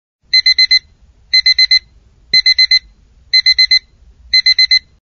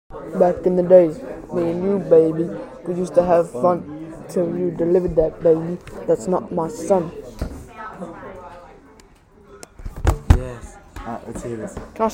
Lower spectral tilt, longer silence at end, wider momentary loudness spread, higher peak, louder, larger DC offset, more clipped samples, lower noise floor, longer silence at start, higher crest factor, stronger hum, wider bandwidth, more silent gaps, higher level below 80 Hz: second, 2.5 dB/octave vs -8 dB/octave; first, 0.25 s vs 0 s; second, 5 LU vs 19 LU; about the same, 0 dBFS vs 0 dBFS; first, -9 LUFS vs -19 LUFS; neither; neither; about the same, -47 dBFS vs -49 dBFS; first, 0.35 s vs 0.1 s; second, 12 dB vs 20 dB; neither; second, 6.8 kHz vs 16 kHz; neither; second, -46 dBFS vs -34 dBFS